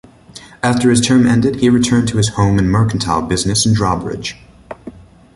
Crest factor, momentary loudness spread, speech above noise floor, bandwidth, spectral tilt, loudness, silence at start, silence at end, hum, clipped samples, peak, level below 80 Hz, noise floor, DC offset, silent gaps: 14 dB; 15 LU; 26 dB; 11.5 kHz; -5 dB/octave; -14 LUFS; 0.35 s; 0.45 s; none; under 0.1%; 0 dBFS; -36 dBFS; -39 dBFS; under 0.1%; none